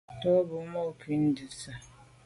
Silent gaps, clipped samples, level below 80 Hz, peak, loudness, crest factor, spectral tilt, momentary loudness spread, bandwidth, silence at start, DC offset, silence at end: none; under 0.1%; -62 dBFS; -14 dBFS; -30 LUFS; 16 dB; -6.5 dB/octave; 16 LU; 11.5 kHz; 0.1 s; under 0.1%; 0.2 s